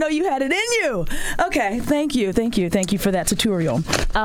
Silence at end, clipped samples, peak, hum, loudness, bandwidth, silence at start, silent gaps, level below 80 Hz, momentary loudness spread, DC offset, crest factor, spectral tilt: 0 s; under 0.1%; -2 dBFS; none; -20 LUFS; 17.5 kHz; 0 s; none; -32 dBFS; 2 LU; under 0.1%; 18 dB; -4 dB/octave